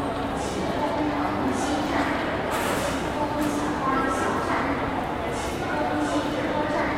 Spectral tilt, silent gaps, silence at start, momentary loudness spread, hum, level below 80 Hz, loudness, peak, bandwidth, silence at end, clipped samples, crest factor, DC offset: -5 dB/octave; none; 0 s; 3 LU; none; -42 dBFS; -26 LUFS; -10 dBFS; 16 kHz; 0 s; under 0.1%; 14 dB; 0.1%